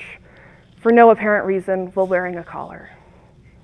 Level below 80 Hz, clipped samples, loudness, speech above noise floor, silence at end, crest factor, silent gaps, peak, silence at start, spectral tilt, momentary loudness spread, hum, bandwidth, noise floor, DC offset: -54 dBFS; under 0.1%; -16 LUFS; 31 dB; 0.85 s; 18 dB; none; 0 dBFS; 0 s; -8 dB/octave; 21 LU; none; 9.4 kHz; -48 dBFS; under 0.1%